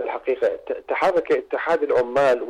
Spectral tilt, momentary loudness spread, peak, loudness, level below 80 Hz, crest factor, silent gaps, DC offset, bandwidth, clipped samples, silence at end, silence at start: -5 dB/octave; 6 LU; -12 dBFS; -22 LUFS; -60 dBFS; 10 dB; none; under 0.1%; 10.5 kHz; under 0.1%; 0 s; 0 s